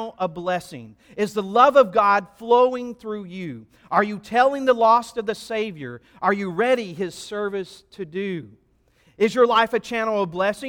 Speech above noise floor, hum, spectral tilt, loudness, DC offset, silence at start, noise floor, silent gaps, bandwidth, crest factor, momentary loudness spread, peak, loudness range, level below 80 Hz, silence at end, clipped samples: 39 dB; none; -5 dB/octave; -21 LUFS; under 0.1%; 0 s; -60 dBFS; none; 17 kHz; 20 dB; 17 LU; -2 dBFS; 6 LU; -62 dBFS; 0 s; under 0.1%